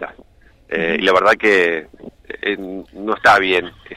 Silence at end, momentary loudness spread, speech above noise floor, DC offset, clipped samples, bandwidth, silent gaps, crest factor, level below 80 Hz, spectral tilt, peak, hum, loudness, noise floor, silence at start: 0 s; 15 LU; 32 dB; under 0.1%; under 0.1%; 15 kHz; none; 16 dB; -50 dBFS; -4 dB/octave; -2 dBFS; none; -16 LUFS; -48 dBFS; 0 s